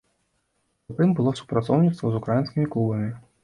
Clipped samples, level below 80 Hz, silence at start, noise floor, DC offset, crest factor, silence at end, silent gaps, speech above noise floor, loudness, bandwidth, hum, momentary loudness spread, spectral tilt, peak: under 0.1%; -56 dBFS; 0.9 s; -72 dBFS; under 0.1%; 16 dB; 0.25 s; none; 50 dB; -24 LUFS; 10.5 kHz; none; 7 LU; -9 dB/octave; -8 dBFS